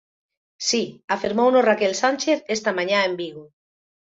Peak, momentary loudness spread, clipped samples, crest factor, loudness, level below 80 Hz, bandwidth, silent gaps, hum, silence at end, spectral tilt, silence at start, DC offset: -6 dBFS; 9 LU; under 0.1%; 18 dB; -21 LUFS; -66 dBFS; 8 kHz; 1.04-1.08 s; none; 0.7 s; -3 dB/octave; 0.6 s; under 0.1%